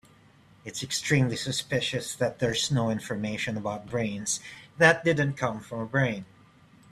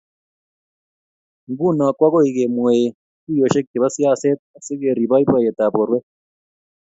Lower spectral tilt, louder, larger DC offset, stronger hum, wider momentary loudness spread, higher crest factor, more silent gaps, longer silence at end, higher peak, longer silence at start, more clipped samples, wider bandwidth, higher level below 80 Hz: second, -4 dB/octave vs -6.5 dB/octave; second, -27 LUFS vs -18 LUFS; neither; neither; first, 12 LU vs 9 LU; first, 24 dB vs 18 dB; second, none vs 2.95-3.27 s, 3.67-3.74 s, 4.39-4.54 s; second, 0.65 s vs 0.8 s; second, -4 dBFS vs 0 dBFS; second, 0.65 s vs 1.5 s; neither; first, 14 kHz vs 8 kHz; about the same, -60 dBFS vs -62 dBFS